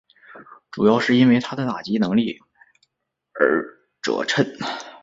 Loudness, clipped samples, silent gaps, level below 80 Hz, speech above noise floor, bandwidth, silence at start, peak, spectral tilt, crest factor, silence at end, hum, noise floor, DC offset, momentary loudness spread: -20 LUFS; under 0.1%; none; -62 dBFS; 59 dB; 7.8 kHz; 0.3 s; -2 dBFS; -6 dB/octave; 20 dB; 0.05 s; none; -78 dBFS; under 0.1%; 17 LU